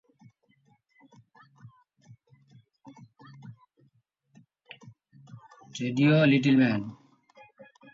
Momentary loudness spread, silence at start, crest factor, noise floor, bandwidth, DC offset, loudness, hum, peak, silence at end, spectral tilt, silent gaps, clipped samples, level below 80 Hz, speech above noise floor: 29 LU; 1.65 s; 20 dB; -69 dBFS; 7.6 kHz; under 0.1%; -24 LUFS; none; -12 dBFS; 1 s; -7 dB/octave; none; under 0.1%; -74 dBFS; 47 dB